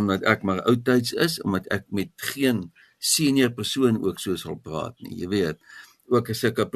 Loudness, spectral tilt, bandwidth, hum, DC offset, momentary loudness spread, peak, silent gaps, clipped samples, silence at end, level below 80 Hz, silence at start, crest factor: -24 LUFS; -4.5 dB/octave; 13.5 kHz; none; under 0.1%; 11 LU; -2 dBFS; none; under 0.1%; 0.05 s; -58 dBFS; 0 s; 22 dB